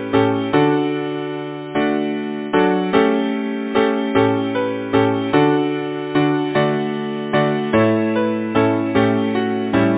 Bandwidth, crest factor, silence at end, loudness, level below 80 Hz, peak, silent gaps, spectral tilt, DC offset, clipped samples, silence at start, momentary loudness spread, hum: 4 kHz; 16 dB; 0 s; -18 LUFS; -52 dBFS; 0 dBFS; none; -10.5 dB/octave; under 0.1%; under 0.1%; 0 s; 7 LU; none